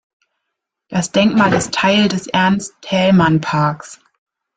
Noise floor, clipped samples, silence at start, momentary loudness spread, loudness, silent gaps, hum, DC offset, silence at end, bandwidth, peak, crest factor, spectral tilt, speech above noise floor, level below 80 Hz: -78 dBFS; under 0.1%; 0.9 s; 8 LU; -15 LUFS; none; none; under 0.1%; 0.6 s; 9.4 kHz; 0 dBFS; 16 dB; -5 dB/octave; 63 dB; -50 dBFS